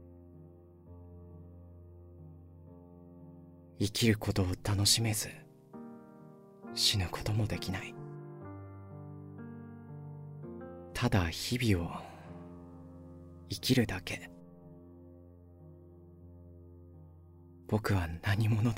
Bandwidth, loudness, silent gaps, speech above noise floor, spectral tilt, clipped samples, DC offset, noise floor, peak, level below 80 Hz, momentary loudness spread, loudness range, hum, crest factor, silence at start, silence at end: 16 kHz; -32 LUFS; none; 24 dB; -4.5 dB/octave; under 0.1%; under 0.1%; -55 dBFS; -14 dBFS; -54 dBFS; 26 LU; 17 LU; none; 22 dB; 0 s; 0 s